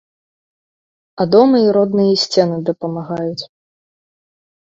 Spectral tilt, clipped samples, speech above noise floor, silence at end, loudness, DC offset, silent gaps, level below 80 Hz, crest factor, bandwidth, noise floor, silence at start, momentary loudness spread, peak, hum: -6 dB/octave; under 0.1%; over 76 dB; 1.2 s; -15 LUFS; under 0.1%; none; -60 dBFS; 18 dB; 7.8 kHz; under -90 dBFS; 1.15 s; 13 LU; 0 dBFS; none